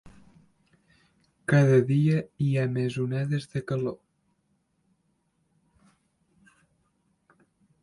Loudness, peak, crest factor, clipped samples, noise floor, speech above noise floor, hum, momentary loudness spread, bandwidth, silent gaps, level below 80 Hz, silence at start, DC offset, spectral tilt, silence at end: -26 LUFS; -10 dBFS; 20 dB; under 0.1%; -72 dBFS; 48 dB; none; 12 LU; 11.5 kHz; none; -64 dBFS; 0.05 s; under 0.1%; -8 dB/octave; 3.9 s